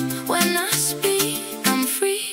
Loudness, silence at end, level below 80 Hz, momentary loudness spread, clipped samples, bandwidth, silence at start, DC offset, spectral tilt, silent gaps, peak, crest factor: -20 LUFS; 0 s; -64 dBFS; 3 LU; under 0.1%; 16.5 kHz; 0 s; under 0.1%; -2.5 dB/octave; none; -2 dBFS; 20 dB